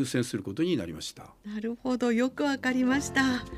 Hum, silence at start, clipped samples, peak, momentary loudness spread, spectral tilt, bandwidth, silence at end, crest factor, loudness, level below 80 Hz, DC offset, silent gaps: none; 0 s; under 0.1%; -12 dBFS; 13 LU; -4.5 dB/octave; 15 kHz; 0 s; 16 dB; -29 LUFS; -56 dBFS; under 0.1%; none